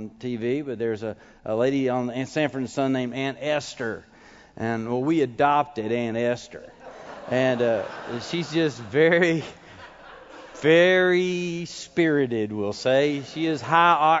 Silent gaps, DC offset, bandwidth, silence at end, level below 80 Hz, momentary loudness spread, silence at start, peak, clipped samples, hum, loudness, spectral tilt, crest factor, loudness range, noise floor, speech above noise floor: none; under 0.1%; 8 kHz; 0 s; -62 dBFS; 20 LU; 0 s; -4 dBFS; under 0.1%; none; -23 LUFS; -5.5 dB/octave; 20 dB; 5 LU; -45 dBFS; 22 dB